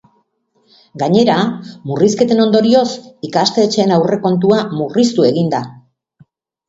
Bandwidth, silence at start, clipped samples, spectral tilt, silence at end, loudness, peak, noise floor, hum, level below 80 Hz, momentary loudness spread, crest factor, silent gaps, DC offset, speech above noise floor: 8 kHz; 0.95 s; under 0.1%; -6 dB/octave; 0.95 s; -14 LUFS; 0 dBFS; -60 dBFS; none; -58 dBFS; 10 LU; 14 dB; none; under 0.1%; 47 dB